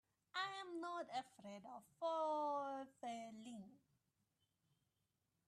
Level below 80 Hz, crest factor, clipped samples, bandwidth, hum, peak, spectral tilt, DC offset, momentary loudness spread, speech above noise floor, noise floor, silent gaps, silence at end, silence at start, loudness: under -90 dBFS; 18 dB; under 0.1%; 13.5 kHz; none; -32 dBFS; -4 dB/octave; under 0.1%; 15 LU; 41 dB; -88 dBFS; none; 1.7 s; 0.35 s; -47 LUFS